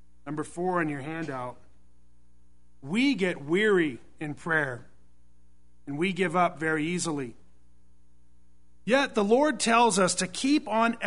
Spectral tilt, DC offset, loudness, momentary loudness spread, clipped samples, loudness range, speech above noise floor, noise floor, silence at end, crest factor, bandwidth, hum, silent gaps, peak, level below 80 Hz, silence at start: -4 dB/octave; 0.5%; -26 LUFS; 16 LU; under 0.1%; 5 LU; 37 dB; -63 dBFS; 0 s; 20 dB; 11 kHz; 60 Hz at -60 dBFS; none; -8 dBFS; -62 dBFS; 0.25 s